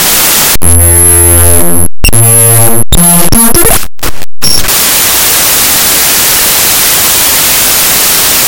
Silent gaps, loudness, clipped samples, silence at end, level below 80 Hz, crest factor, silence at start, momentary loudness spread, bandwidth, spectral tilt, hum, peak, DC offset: none; -3 LUFS; 10%; 0 s; -20 dBFS; 6 dB; 0 s; 5 LU; over 20 kHz; -2 dB/octave; none; 0 dBFS; under 0.1%